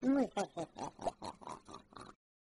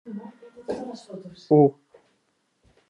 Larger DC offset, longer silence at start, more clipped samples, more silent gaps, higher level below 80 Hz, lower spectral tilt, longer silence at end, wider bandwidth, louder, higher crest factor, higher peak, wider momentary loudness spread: neither; about the same, 0 s vs 0.05 s; neither; neither; about the same, -66 dBFS vs -70 dBFS; second, -5.5 dB/octave vs -9.5 dB/octave; second, 0.35 s vs 1.2 s; first, 11.5 kHz vs 9.8 kHz; second, -41 LUFS vs -22 LUFS; about the same, 18 dB vs 20 dB; second, -22 dBFS vs -6 dBFS; about the same, 21 LU vs 23 LU